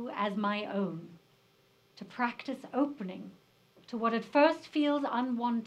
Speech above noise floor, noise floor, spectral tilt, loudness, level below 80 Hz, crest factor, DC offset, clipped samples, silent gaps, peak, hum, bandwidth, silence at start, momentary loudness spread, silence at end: 35 dB; -67 dBFS; -6.5 dB/octave; -32 LUFS; -84 dBFS; 22 dB; under 0.1%; under 0.1%; none; -12 dBFS; none; 9.2 kHz; 0 s; 19 LU; 0 s